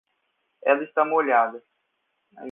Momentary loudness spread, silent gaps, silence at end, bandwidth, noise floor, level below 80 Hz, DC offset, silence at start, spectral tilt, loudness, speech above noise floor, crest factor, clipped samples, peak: 8 LU; none; 0 s; 3.8 kHz; -75 dBFS; -86 dBFS; under 0.1%; 0.65 s; -7.5 dB/octave; -22 LUFS; 53 dB; 20 dB; under 0.1%; -6 dBFS